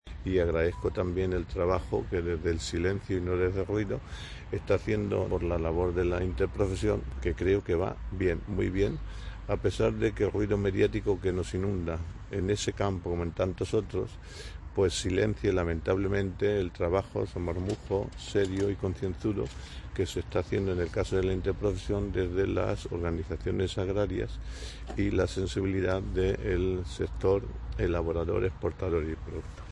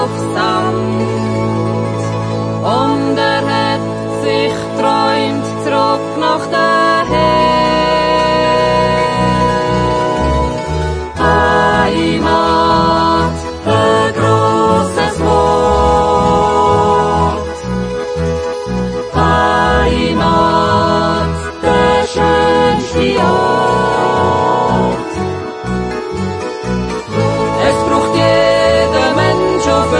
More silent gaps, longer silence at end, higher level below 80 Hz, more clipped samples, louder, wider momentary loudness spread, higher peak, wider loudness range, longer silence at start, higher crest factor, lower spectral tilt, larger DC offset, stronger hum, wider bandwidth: neither; about the same, 0 s vs 0 s; second, -42 dBFS vs -28 dBFS; neither; second, -31 LUFS vs -13 LUFS; about the same, 7 LU vs 8 LU; second, -12 dBFS vs 0 dBFS; about the same, 2 LU vs 3 LU; about the same, 0.05 s vs 0 s; first, 18 dB vs 12 dB; about the same, -6.5 dB/octave vs -5.5 dB/octave; neither; neither; about the same, 11.5 kHz vs 10.5 kHz